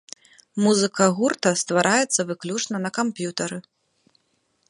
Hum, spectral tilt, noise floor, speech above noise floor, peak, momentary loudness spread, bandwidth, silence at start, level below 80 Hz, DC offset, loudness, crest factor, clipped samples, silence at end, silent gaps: none; -3.5 dB/octave; -69 dBFS; 47 dB; -2 dBFS; 13 LU; 11.5 kHz; 0.55 s; -70 dBFS; under 0.1%; -22 LUFS; 22 dB; under 0.1%; 1.1 s; none